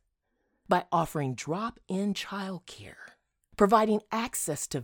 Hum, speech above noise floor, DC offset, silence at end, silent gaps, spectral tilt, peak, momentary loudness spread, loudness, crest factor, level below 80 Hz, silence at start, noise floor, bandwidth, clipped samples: none; 48 dB; under 0.1%; 0 s; none; -5 dB/octave; -8 dBFS; 19 LU; -29 LUFS; 22 dB; -60 dBFS; 0.7 s; -77 dBFS; 18 kHz; under 0.1%